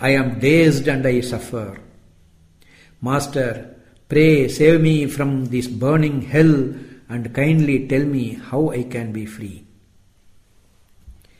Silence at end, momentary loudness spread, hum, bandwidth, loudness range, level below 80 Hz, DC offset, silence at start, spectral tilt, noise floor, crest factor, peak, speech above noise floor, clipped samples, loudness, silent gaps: 0.3 s; 16 LU; none; 15.5 kHz; 8 LU; -46 dBFS; under 0.1%; 0 s; -7 dB/octave; -53 dBFS; 18 dB; -2 dBFS; 36 dB; under 0.1%; -18 LUFS; none